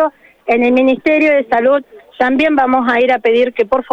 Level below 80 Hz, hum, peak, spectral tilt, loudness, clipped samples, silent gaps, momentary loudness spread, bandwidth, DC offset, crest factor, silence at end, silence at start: -50 dBFS; none; -4 dBFS; -5.5 dB/octave; -13 LUFS; under 0.1%; none; 6 LU; 7.6 kHz; under 0.1%; 10 dB; 0.1 s; 0 s